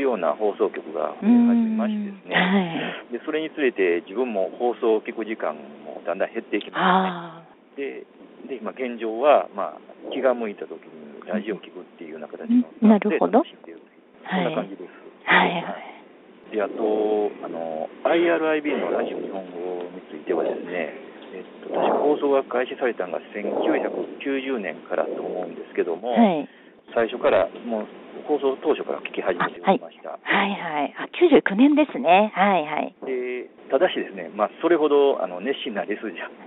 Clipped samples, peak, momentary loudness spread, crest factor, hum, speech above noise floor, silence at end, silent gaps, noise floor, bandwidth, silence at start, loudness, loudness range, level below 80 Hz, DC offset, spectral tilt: under 0.1%; -4 dBFS; 18 LU; 20 dB; none; 26 dB; 0 s; none; -49 dBFS; 4.1 kHz; 0 s; -23 LUFS; 6 LU; -70 dBFS; under 0.1%; -4 dB/octave